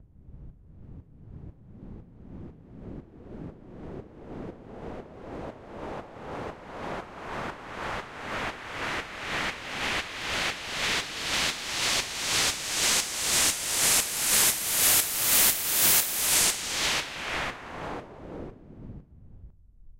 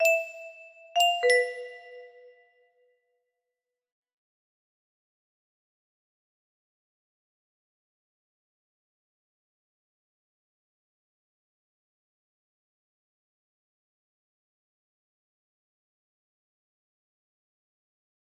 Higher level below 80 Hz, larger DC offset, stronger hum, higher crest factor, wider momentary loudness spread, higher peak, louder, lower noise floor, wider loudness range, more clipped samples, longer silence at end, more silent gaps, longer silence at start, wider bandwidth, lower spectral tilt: first, -50 dBFS vs -88 dBFS; neither; neither; about the same, 22 dB vs 26 dB; about the same, 25 LU vs 24 LU; first, -8 dBFS vs -12 dBFS; about the same, -25 LUFS vs -25 LUFS; second, -50 dBFS vs -88 dBFS; first, 22 LU vs 16 LU; neither; second, 0 s vs 16.25 s; neither; about the same, 0 s vs 0 s; first, 16 kHz vs 13.5 kHz; first, -0.5 dB/octave vs 2.5 dB/octave